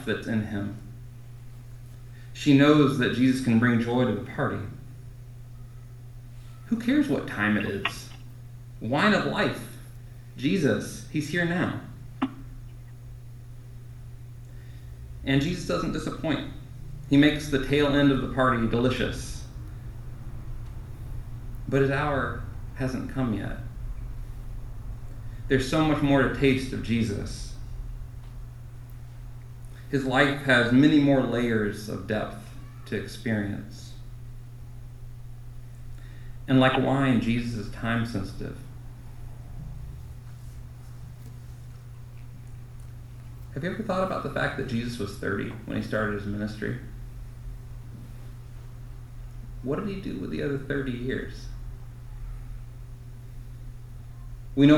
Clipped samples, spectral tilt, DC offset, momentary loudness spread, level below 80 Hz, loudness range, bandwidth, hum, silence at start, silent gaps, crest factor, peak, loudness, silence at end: under 0.1%; -6.5 dB/octave; under 0.1%; 22 LU; -42 dBFS; 15 LU; 14 kHz; none; 0 s; none; 22 dB; -6 dBFS; -26 LUFS; 0 s